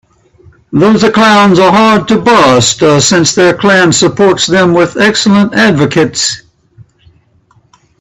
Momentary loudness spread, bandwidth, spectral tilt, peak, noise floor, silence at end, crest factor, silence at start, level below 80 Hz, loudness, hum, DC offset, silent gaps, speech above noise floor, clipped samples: 5 LU; 12.5 kHz; -4 dB/octave; 0 dBFS; -48 dBFS; 1.6 s; 8 dB; 0.7 s; -44 dBFS; -7 LUFS; none; under 0.1%; none; 42 dB; 0.2%